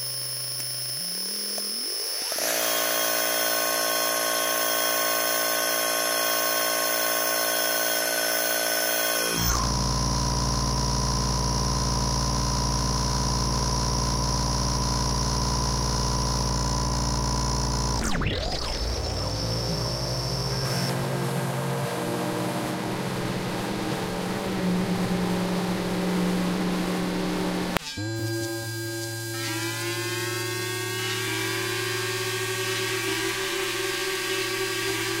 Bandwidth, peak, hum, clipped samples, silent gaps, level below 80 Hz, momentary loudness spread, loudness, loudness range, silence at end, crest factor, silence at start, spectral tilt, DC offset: 16.5 kHz; 0 dBFS; none; under 0.1%; none; -36 dBFS; 6 LU; -25 LUFS; 6 LU; 0 s; 26 dB; 0 s; -3 dB/octave; under 0.1%